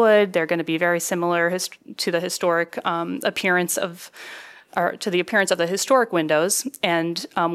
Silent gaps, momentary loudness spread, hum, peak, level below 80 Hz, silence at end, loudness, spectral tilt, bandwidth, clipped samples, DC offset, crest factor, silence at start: none; 11 LU; none; -4 dBFS; -74 dBFS; 0 s; -22 LUFS; -3.5 dB/octave; 15.5 kHz; under 0.1%; under 0.1%; 18 dB; 0 s